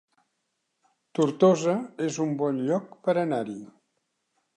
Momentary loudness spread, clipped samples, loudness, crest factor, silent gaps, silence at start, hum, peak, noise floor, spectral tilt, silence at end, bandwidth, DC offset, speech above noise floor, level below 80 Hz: 12 LU; under 0.1%; -26 LUFS; 20 dB; none; 1.15 s; none; -8 dBFS; -78 dBFS; -6.5 dB/octave; 0.9 s; 10 kHz; under 0.1%; 53 dB; -80 dBFS